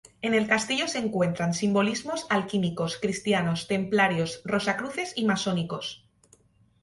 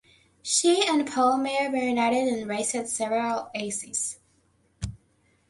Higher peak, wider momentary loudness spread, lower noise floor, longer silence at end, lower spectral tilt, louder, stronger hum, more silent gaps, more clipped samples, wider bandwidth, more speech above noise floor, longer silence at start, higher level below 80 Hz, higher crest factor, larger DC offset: about the same, -8 dBFS vs -8 dBFS; second, 7 LU vs 17 LU; second, -61 dBFS vs -66 dBFS; first, 0.85 s vs 0.55 s; first, -4.5 dB/octave vs -2.5 dB/octave; about the same, -26 LUFS vs -25 LUFS; neither; neither; neither; about the same, 11.5 kHz vs 11.5 kHz; second, 35 dB vs 41 dB; second, 0.2 s vs 0.45 s; second, -62 dBFS vs -54 dBFS; about the same, 18 dB vs 18 dB; neither